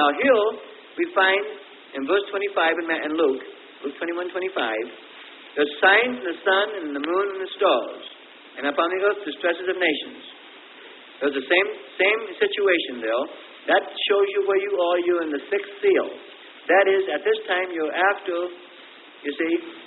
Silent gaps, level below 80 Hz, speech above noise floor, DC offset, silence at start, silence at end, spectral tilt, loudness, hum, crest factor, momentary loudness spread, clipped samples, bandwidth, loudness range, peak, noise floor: none; -76 dBFS; 23 dB; under 0.1%; 0 s; 0 s; -7.5 dB/octave; -22 LUFS; none; 18 dB; 19 LU; under 0.1%; 4.2 kHz; 3 LU; -4 dBFS; -46 dBFS